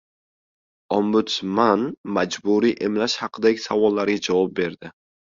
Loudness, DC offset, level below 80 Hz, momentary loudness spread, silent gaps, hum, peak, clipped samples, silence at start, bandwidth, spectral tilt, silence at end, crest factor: -21 LUFS; under 0.1%; -62 dBFS; 6 LU; 1.97-2.04 s; none; -4 dBFS; under 0.1%; 0.9 s; 7.6 kHz; -5 dB/octave; 0.5 s; 18 dB